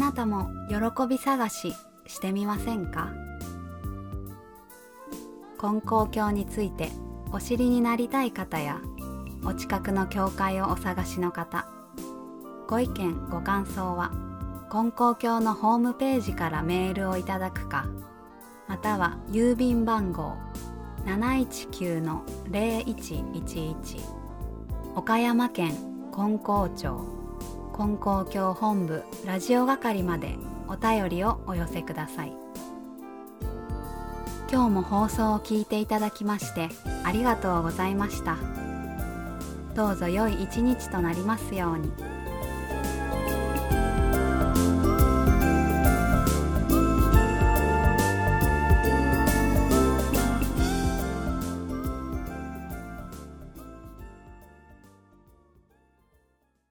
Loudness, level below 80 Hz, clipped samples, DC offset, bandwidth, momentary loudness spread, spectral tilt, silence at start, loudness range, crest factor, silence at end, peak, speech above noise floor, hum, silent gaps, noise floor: -27 LUFS; -34 dBFS; under 0.1%; under 0.1%; over 20 kHz; 16 LU; -6 dB/octave; 0 s; 9 LU; 20 dB; 1.95 s; -8 dBFS; 42 dB; none; none; -69 dBFS